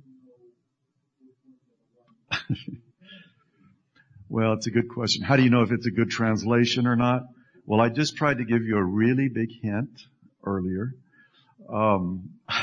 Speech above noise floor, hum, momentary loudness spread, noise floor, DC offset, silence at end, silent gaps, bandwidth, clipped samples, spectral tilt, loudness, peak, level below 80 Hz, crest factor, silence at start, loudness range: 52 dB; none; 12 LU; -76 dBFS; under 0.1%; 0 s; none; 9.4 kHz; under 0.1%; -6 dB/octave; -25 LUFS; -6 dBFS; -62 dBFS; 20 dB; 2.3 s; 15 LU